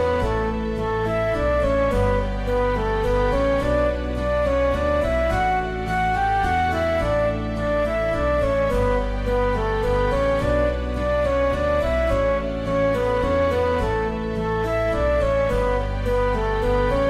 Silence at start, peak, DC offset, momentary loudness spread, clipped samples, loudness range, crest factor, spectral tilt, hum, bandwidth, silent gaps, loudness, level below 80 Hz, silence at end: 0 s; -8 dBFS; under 0.1%; 4 LU; under 0.1%; 1 LU; 12 dB; -7 dB/octave; none; 12.5 kHz; none; -22 LUFS; -28 dBFS; 0 s